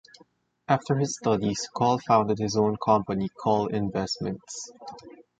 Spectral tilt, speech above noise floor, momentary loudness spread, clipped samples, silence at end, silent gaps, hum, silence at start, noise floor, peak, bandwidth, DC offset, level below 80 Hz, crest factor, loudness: -5.5 dB/octave; 35 dB; 16 LU; under 0.1%; 0.3 s; none; none; 0.7 s; -61 dBFS; -6 dBFS; 9.4 kHz; under 0.1%; -58 dBFS; 20 dB; -26 LUFS